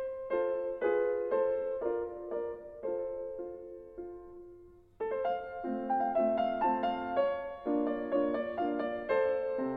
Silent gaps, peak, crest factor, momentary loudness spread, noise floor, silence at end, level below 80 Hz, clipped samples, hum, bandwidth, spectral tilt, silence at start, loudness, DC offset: none; -18 dBFS; 14 dB; 15 LU; -55 dBFS; 0 s; -64 dBFS; under 0.1%; none; 4.9 kHz; -8 dB/octave; 0 s; -33 LUFS; under 0.1%